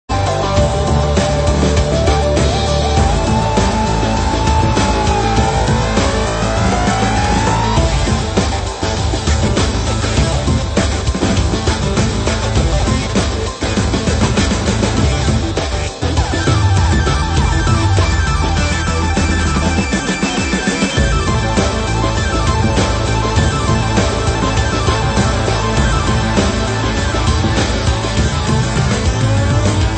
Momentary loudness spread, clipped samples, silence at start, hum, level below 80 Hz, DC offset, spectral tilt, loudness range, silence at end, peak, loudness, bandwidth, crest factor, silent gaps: 2 LU; under 0.1%; 0.1 s; none; -20 dBFS; under 0.1%; -5 dB/octave; 1 LU; 0 s; 0 dBFS; -15 LUFS; 8.8 kHz; 14 dB; none